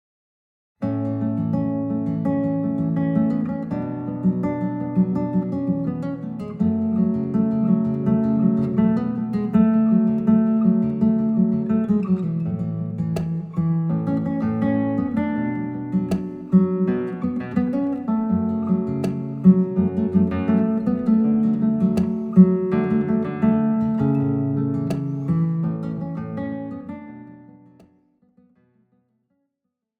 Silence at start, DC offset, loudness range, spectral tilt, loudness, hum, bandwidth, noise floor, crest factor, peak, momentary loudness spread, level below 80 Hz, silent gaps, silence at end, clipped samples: 0.8 s; under 0.1%; 5 LU; -10.5 dB/octave; -21 LUFS; none; 4.9 kHz; -80 dBFS; 20 dB; -2 dBFS; 9 LU; -56 dBFS; none; 2.55 s; under 0.1%